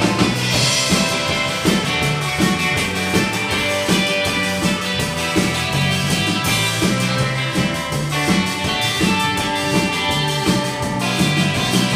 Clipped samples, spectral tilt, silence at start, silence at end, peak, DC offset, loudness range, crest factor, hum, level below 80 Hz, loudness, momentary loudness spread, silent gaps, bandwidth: under 0.1%; -4 dB/octave; 0 s; 0 s; -2 dBFS; under 0.1%; 1 LU; 16 dB; none; -40 dBFS; -17 LUFS; 3 LU; none; 15.5 kHz